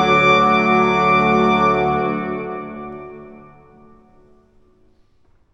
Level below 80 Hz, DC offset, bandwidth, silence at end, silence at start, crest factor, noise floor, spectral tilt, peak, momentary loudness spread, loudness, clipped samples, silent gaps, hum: -44 dBFS; under 0.1%; 8 kHz; 2.15 s; 0 s; 18 dB; -55 dBFS; -6 dB/octave; -2 dBFS; 20 LU; -15 LUFS; under 0.1%; none; none